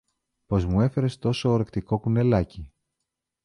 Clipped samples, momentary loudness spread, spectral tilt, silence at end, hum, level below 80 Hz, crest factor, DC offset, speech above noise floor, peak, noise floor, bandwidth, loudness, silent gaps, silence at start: under 0.1%; 6 LU; -8 dB/octave; 0.75 s; none; -42 dBFS; 16 dB; under 0.1%; 60 dB; -8 dBFS; -83 dBFS; 10.5 kHz; -25 LUFS; none; 0.5 s